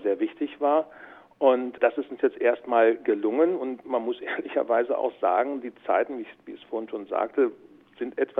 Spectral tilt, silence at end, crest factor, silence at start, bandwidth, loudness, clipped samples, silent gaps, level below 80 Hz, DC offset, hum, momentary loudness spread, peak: -7.5 dB/octave; 0 s; 18 dB; 0 s; 4 kHz; -26 LUFS; under 0.1%; none; -74 dBFS; under 0.1%; none; 12 LU; -8 dBFS